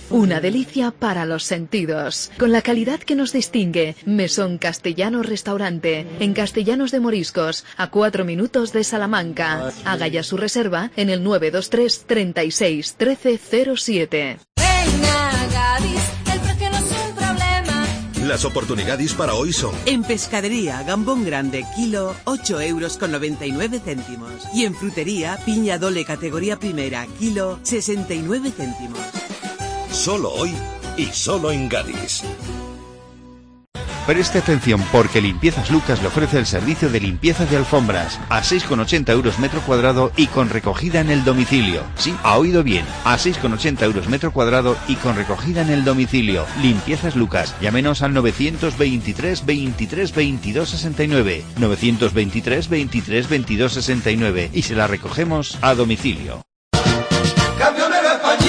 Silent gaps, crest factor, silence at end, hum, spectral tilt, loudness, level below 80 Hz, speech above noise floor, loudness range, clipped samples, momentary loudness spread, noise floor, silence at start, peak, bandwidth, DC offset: 56.56-56.71 s; 18 dB; 0 s; none; -4.5 dB/octave; -19 LUFS; -34 dBFS; 24 dB; 6 LU; under 0.1%; 7 LU; -43 dBFS; 0 s; -2 dBFS; 10.5 kHz; under 0.1%